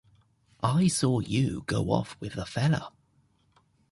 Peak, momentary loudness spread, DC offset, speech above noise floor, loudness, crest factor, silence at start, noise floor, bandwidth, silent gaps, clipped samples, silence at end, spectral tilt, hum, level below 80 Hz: -10 dBFS; 11 LU; under 0.1%; 40 dB; -28 LUFS; 20 dB; 0.6 s; -67 dBFS; 11.5 kHz; none; under 0.1%; 1 s; -5.5 dB/octave; none; -52 dBFS